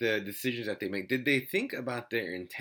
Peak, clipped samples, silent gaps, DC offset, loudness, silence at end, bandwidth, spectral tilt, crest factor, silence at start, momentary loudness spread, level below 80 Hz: -14 dBFS; under 0.1%; none; under 0.1%; -32 LUFS; 0 s; 19 kHz; -4.5 dB/octave; 20 dB; 0 s; 7 LU; -80 dBFS